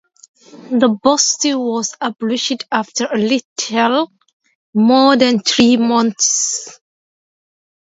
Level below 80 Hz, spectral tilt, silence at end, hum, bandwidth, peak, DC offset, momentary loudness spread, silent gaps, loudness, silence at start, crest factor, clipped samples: -60 dBFS; -2.5 dB/octave; 1.1 s; none; 8 kHz; 0 dBFS; under 0.1%; 10 LU; 3.45-3.56 s, 4.33-4.40 s, 4.55-4.73 s; -15 LUFS; 0.55 s; 16 dB; under 0.1%